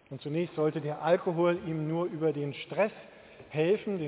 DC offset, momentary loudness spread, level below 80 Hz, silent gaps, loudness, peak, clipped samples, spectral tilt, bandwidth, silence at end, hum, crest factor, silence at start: under 0.1%; 7 LU; -70 dBFS; none; -31 LUFS; -12 dBFS; under 0.1%; -11 dB/octave; 4 kHz; 0 s; none; 18 dB; 0.1 s